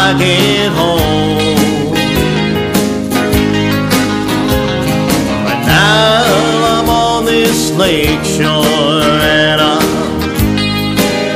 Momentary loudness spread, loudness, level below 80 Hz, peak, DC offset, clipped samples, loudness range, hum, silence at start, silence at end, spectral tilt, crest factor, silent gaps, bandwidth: 5 LU; -11 LUFS; -28 dBFS; 0 dBFS; under 0.1%; under 0.1%; 2 LU; none; 0 s; 0 s; -4.5 dB/octave; 10 dB; none; 15.5 kHz